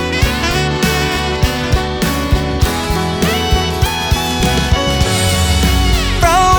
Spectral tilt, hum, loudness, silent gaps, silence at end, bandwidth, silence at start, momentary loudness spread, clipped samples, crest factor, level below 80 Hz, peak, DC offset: -4.5 dB/octave; none; -14 LUFS; none; 0 s; over 20 kHz; 0 s; 3 LU; under 0.1%; 14 dB; -20 dBFS; 0 dBFS; under 0.1%